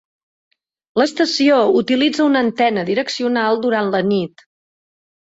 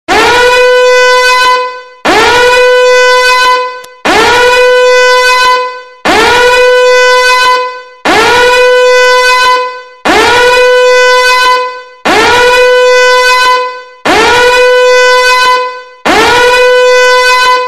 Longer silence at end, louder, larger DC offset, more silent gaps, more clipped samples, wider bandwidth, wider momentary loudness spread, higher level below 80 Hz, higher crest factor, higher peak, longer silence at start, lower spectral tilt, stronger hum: first, 0.95 s vs 0 s; second, -16 LUFS vs -5 LUFS; neither; neither; second, under 0.1% vs 0.2%; second, 8 kHz vs 14 kHz; about the same, 6 LU vs 7 LU; second, -62 dBFS vs -34 dBFS; first, 14 dB vs 6 dB; second, -4 dBFS vs 0 dBFS; first, 0.95 s vs 0.1 s; first, -5 dB/octave vs -1.5 dB/octave; neither